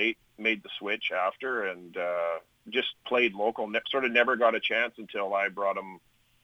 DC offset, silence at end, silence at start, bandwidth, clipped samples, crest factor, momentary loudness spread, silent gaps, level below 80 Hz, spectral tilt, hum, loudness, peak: under 0.1%; 0.45 s; 0 s; 11 kHz; under 0.1%; 20 dB; 10 LU; none; -74 dBFS; -4.5 dB/octave; none; -28 LUFS; -8 dBFS